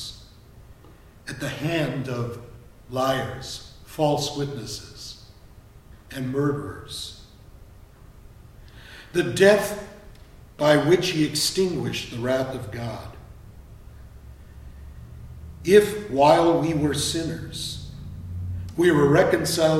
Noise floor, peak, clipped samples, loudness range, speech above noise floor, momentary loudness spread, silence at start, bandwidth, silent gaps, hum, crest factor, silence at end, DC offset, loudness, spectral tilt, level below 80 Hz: -49 dBFS; -2 dBFS; under 0.1%; 11 LU; 27 dB; 24 LU; 0 s; 16 kHz; none; none; 24 dB; 0 s; under 0.1%; -23 LUFS; -5 dB/octave; -46 dBFS